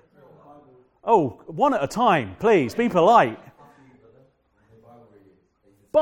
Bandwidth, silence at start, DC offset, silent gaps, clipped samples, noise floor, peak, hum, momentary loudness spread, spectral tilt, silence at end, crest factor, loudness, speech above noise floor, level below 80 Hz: 17 kHz; 1.05 s; under 0.1%; none; under 0.1%; -61 dBFS; -2 dBFS; none; 10 LU; -6 dB/octave; 0 s; 20 dB; -20 LUFS; 42 dB; -60 dBFS